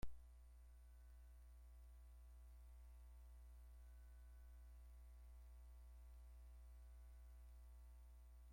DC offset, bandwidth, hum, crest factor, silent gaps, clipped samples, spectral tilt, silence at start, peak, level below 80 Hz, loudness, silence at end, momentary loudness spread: under 0.1%; 16 kHz; 60 Hz at -60 dBFS; 22 dB; none; under 0.1%; -6 dB/octave; 0 s; -36 dBFS; -62 dBFS; -65 LUFS; 0 s; 2 LU